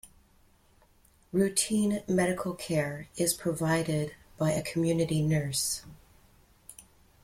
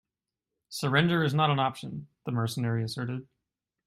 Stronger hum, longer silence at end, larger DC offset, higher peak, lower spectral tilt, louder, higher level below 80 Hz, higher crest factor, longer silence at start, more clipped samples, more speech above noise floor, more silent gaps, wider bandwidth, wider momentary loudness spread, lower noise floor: neither; second, 0.45 s vs 0.65 s; neither; second, -14 dBFS vs -10 dBFS; second, -4.5 dB/octave vs -6 dB/octave; about the same, -29 LUFS vs -28 LUFS; first, -58 dBFS vs -66 dBFS; about the same, 18 dB vs 20 dB; second, 0.05 s vs 0.7 s; neither; second, 34 dB vs 61 dB; neither; first, 16.5 kHz vs 14 kHz; second, 9 LU vs 15 LU; second, -63 dBFS vs -89 dBFS